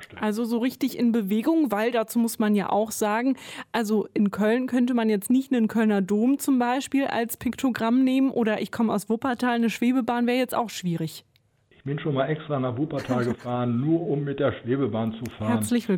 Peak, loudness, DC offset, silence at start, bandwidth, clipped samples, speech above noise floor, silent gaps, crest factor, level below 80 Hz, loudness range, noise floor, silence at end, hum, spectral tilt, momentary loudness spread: -10 dBFS; -25 LUFS; under 0.1%; 0 s; 17.5 kHz; under 0.1%; 38 dB; none; 14 dB; -62 dBFS; 4 LU; -62 dBFS; 0 s; none; -6 dB/octave; 6 LU